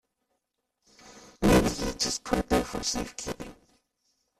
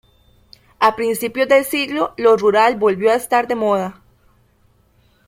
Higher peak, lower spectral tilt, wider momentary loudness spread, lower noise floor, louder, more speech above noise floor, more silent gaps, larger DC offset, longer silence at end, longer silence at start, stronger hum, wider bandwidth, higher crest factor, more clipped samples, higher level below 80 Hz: second, -10 dBFS vs 0 dBFS; about the same, -4 dB/octave vs -4 dB/octave; first, 15 LU vs 7 LU; first, -80 dBFS vs -57 dBFS; second, -27 LUFS vs -16 LUFS; first, 49 dB vs 41 dB; neither; neither; second, 0.9 s vs 1.35 s; first, 1.05 s vs 0.8 s; second, none vs 60 Hz at -50 dBFS; about the same, 15 kHz vs 16.5 kHz; about the same, 20 dB vs 18 dB; neither; first, -42 dBFS vs -56 dBFS